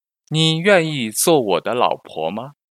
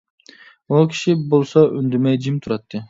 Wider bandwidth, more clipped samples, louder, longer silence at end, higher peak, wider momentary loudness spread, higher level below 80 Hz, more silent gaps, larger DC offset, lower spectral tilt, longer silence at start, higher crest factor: first, 15 kHz vs 7.8 kHz; neither; about the same, -18 LUFS vs -18 LUFS; first, 0.2 s vs 0.05 s; about the same, 0 dBFS vs 0 dBFS; first, 11 LU vs 7 LU; second, -68 dBFS vs -60 dBFS; neither; neither; second, -4 dB/octave vs -7.5 dB/octave; second, 0.3 s vs 0.7 s; about the same, 18 dB vs 18 dB